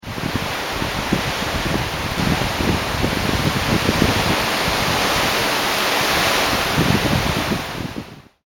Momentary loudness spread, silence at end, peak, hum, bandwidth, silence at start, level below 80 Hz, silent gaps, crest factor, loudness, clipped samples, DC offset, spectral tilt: 6 LU; 0.25 s; 0 dBFS; none; 18.5 kHz; 0.05 s; -34 dBFS; none; 20 dB; -19 LUFS; under 0.1%; under 0.1%; -4 dB/octave